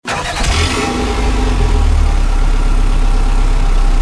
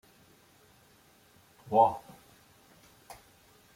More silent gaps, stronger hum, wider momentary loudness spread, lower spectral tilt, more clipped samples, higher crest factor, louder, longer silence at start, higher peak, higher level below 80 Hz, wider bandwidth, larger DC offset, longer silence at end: neither; neither; second, 3 LU vs 27 LU; second, -4.5 dB/octave vs -6.5 dB/octave; neither; second, 10 dB vs 24 dB; first, -16 LUFS vs -27 LUFS; second, 0.05 s vs 1.7 s; first, -2 dBFS vs -10 dBFS; first, -12 dBFS vs -72 dBFS; second, 11 kHz vs 16.5 kHz; neither; second, 0 s vs 1.8 s